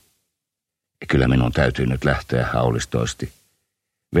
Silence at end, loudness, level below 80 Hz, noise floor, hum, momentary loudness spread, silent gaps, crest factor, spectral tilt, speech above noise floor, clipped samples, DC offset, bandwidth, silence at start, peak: 0 s; -21 LUFS; -34 dBFS; -84 dBFS; none; 11 LU; none; 20 dB; -6 dB/octave; 64 dB; under 0.1%; under 0.1%; 14 kHz; 1 s; -2 dBFS